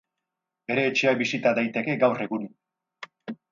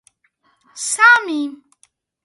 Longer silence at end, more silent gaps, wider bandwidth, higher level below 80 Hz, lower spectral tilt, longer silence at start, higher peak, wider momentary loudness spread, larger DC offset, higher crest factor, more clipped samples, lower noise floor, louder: second, 0.15 s vs 0.7 s; neither; second, 7.4 kHz vs 11.5 kHz; about the same, -74 dBFS vs -74 dBFS; first, -5 dB/octave vs 1 dB/octave; about the same, 0.7 s vs 0.75 s; second, -8 dBFS vs 0 dBFS; first, 19 LU vs 16 LU; neither; about the same, 20 dB vs 18 dB; neither; first, -85 dBFS vs -63 dBFS; second, -24 LUFS vs -14 LUFS